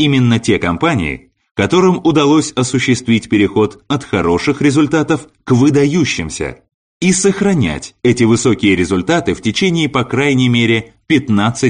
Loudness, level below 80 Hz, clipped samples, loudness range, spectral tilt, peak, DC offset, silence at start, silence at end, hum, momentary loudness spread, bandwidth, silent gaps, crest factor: -13 LUFS; -40 dBFS; under 0.1%; 1 LU; -5 dB/octave; 0 dBFS; under 0.1%; 0 s; 0 s; none; 7 LU; 10 kHz; 1.51-1.55 s, 6.74-7.00 s; 12 dB